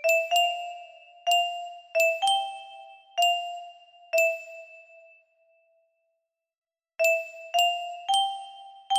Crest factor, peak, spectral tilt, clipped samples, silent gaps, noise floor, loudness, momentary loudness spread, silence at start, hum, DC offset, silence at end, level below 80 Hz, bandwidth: 18 dB; -10 dBFS; 3 dB/octave; under 0.1%; 6.58-6.62 s; -81 dBFS; -26 LUFS; 21 LU; 0 s; none; under 0.1%; 0 s; -84 dBFS; 15.5 kHz